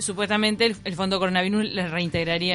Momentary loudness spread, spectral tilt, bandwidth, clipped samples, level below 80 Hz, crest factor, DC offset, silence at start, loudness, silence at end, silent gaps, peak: 5 LU; -4 dB/octave; 11.5 kHz; under 0.1%; -52 dBFS; 16 dB; under 0.1%; 0 s; -23 LUFS; 0 s; none; -8 dBFS